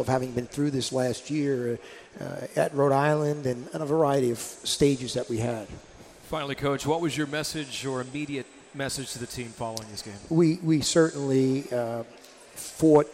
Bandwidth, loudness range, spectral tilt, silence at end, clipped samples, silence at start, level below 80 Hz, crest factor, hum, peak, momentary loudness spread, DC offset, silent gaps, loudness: 16 kHz; 5 LU; -5 dB/octave; 0 s; under 0.1%; 0 s; -56 dBFS; 20 dB; none; -8 dBFS; 14 LU; under 0.1%; none; -27 LUFS